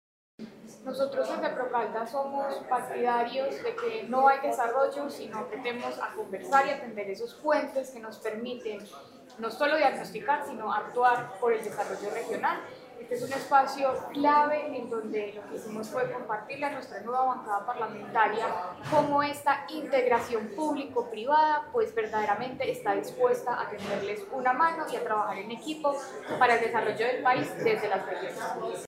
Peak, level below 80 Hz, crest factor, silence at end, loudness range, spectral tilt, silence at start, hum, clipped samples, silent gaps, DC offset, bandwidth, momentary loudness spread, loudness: -8 dBFS; -74 dBFS; 20 dB; 0 s; 3 LU; -4.5 dB/octave; 0.4 s; none; under 0.1%; none; under 0.1%; 16 kHz; 12 LU; -29 LUFS